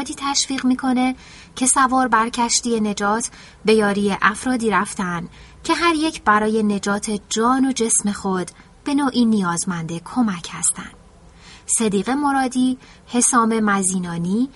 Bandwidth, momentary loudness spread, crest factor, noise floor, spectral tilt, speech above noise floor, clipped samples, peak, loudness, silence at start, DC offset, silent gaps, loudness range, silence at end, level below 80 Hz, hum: 11.5 kHz; 9 LU; 20 dB; -46 dBFS; -3.5 dB/octave; 26 dB; under 0.1%; 0 dBFS; -19 LUFS; 0 s; under 0.1%; none; 3 LU; 0.05 s; -50 dBFS; none